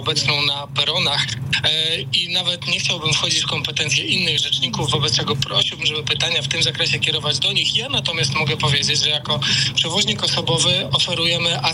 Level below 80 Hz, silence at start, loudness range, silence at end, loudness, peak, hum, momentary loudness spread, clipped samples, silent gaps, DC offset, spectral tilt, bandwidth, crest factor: -50 dBFS; 0 s; 1 LU; 0 s; -17 LUFS; -8 dBFS; none; 3 LU; under 0.1%; none; under 0.1%; -2.5 dB/octave; 16 kHz; 12 dB